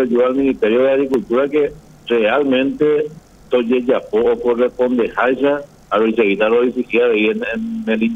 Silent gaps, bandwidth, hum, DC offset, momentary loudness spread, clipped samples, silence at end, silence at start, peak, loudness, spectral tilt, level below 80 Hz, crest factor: none; 8 kHz; none; under 0.1%; 6 LU; under 0.1%; 0 s; 0 s; -2 dBFS; -16 LUFS; -6.5 dB/octave; -50 dBFS; 14 dB